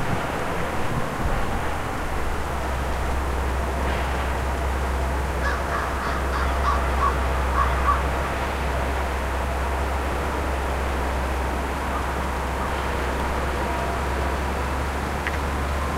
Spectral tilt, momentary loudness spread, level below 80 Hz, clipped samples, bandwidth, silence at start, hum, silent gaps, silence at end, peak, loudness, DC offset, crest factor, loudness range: -5.5 dB/octave; 4 LU; -28 dBFS; under 0.1%; 15.5 kHz; 0 s; none; none; 0 s; -8 dBFS; -25 LUFS; under 0.1%; 16 dB; 3 LU